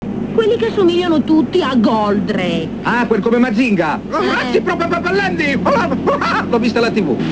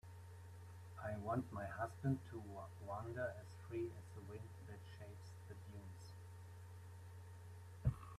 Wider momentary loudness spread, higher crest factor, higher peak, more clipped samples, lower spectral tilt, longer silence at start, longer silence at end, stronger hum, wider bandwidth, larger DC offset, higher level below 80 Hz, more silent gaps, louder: second, 4 LU vs 14 LU; second, 12 dB vs 24 dB; first, -2 dBFS vs -26 dBFS; neither; about the same, -6.5 dB/octave vs -7.5 dB/octave; about the same, 0 s vs 0.05 s; about the same, 0 s vs 0 s; neither; second, 8 kHz vs 14 kHz; neither; first, -42 dBFS vs -64 dBFS; neither; first, -15 LUFS vs -50 LUFS